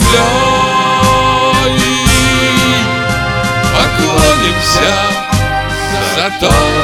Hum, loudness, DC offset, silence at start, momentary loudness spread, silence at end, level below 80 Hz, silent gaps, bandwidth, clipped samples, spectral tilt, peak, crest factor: none; -10 LUFS; under 0.1%; 0 s; 5 LU; 0 s; -22 dBFS; none; 18.5 kHz; under 0.1%; -3.5 dB/octave; 0 dBFS; 10 dB